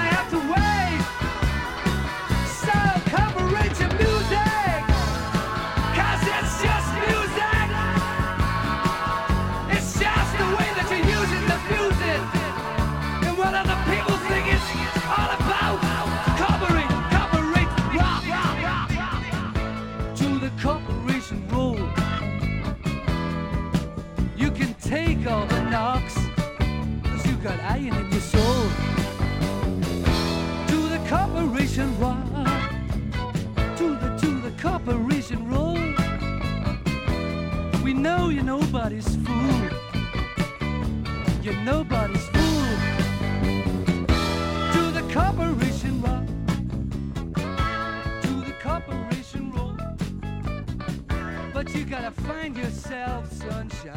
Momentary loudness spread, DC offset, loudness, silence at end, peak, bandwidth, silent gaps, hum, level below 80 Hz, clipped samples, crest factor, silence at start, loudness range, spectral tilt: 8 LU; under 0.1%; -24 LUFS; 0 s; -6 dBFS; 17 kHz; none; none; -32 dBFS; under 0.1%; 18 dB; 0 s; 5 LU; -5.5 dB/octave